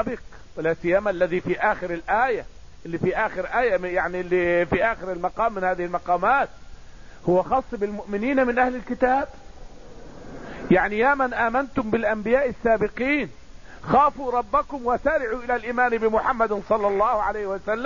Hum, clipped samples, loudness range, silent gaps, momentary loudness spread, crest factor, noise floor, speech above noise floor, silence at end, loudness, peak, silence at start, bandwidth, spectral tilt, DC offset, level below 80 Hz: none; under 0.1%; 2 LU; none; 9 LU; 18 dB; -43 dBFS; 20 dB; 0 s; -23 LUFS; -6 dBFS; 0 s; 7.4 kHz; -7 dB/octave; 0.6%; -44 dBFS